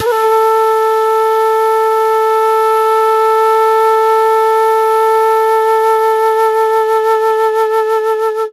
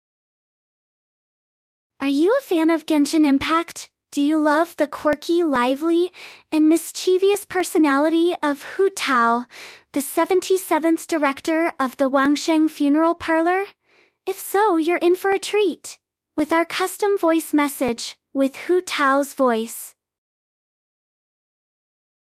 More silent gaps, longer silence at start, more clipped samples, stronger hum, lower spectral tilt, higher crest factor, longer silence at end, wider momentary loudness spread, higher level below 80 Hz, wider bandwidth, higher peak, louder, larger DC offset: neither; second, 0 s vs 2 s; neither; neither; second, -1.5 dB/octave vs -3 dB/octave; second, 8 dB vs 16 dB; second, 0 s vs 2.45 s; second, 2 LU vs 11 LU; about the same, -66 dBFS vs -62 dBFS; second, 14 kHz vs 15.5 kHz; first, -2 dBFS vs -6 dBFS; first, -11 LUFS vs -20 LUFS; neither